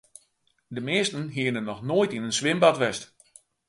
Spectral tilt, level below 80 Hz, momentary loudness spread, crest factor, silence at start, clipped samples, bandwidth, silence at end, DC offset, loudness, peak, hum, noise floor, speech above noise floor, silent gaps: -4 dB/octave; -66 dBFS; 15 LU; 22 dB; 0.7 s; under 0.1%; 11.5 kHz; 0.65 s; under 0.1%; -25 LUFS; -6 dBFS; none; -69 dBFS; 44 dB; none